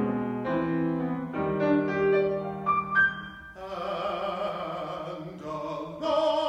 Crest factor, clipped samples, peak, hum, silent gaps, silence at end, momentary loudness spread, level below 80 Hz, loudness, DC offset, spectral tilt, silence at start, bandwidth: 16 dB; under 0.1%; -12 dBFS; none; none; 0 s; 13 LU; -58 dBFS; -28 LUFS; under 0.1%; -7 dB/octave; 0 s; 9 kHz